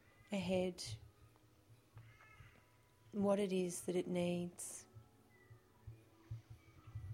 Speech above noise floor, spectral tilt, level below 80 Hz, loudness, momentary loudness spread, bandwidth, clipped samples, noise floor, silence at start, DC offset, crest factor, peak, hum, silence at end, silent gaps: 30 dB; -5.5 dB/octave; -70 dBFS; -41 LUFS; 25 LU; 16.5 kHz; under 0.1%; -69 dBFS; 0.3 s; under 0.1%; 22 dB; -24 dBFS; none; 0 s; none